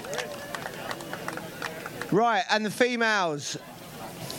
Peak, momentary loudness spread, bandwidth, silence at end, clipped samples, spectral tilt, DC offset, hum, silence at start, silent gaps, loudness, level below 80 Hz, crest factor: -8 dBFS; 14 LU; 17 kHz; 0 s; under 0.1%; -3.5 dB/octave; under 0.1%; none; 0 s; none; -28 LUFS; -64 dBFS; 22 dB